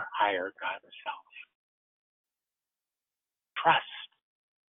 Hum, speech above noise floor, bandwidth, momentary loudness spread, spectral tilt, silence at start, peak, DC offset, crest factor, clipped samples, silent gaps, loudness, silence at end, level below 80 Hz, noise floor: none; over 60 dB; 3.9 kHz; 22 LU; 0.5 dB/octave; 0 s; -10 dBFS; under 0.1%; 24 dB; under 0.1%; 1.55-2.24 s; -31 LUFS; 0.65 s; -76 dBFS; under -90 dBFS